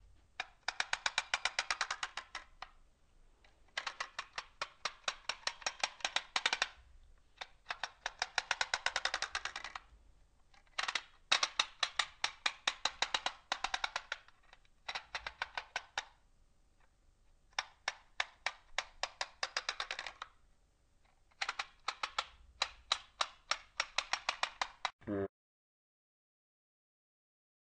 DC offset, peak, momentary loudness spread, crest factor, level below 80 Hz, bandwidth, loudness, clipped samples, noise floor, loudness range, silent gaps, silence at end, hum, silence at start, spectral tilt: under 0.1%; -12 dBFS; 12 LU; 30 dB; -66 dBFS; 9.4 kHz; -39 LUFS; under 0.1%; -70 dBFS; 8 LU; 24.93-24.99 s; 2.4 s; none; 0.4 s; 0 dB/octave